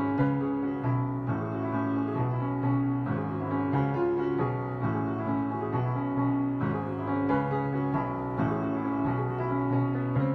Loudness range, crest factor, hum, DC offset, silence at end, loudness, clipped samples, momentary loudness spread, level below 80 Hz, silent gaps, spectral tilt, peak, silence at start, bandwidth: 1 LU; 14 dB; none; under 0.1%; 0 s; -29 LUFS; under 0.1%; 3 LU; -54 dBFS; none; -11 dB/octave; -14 dBFS; 0 s; 4.5 kHz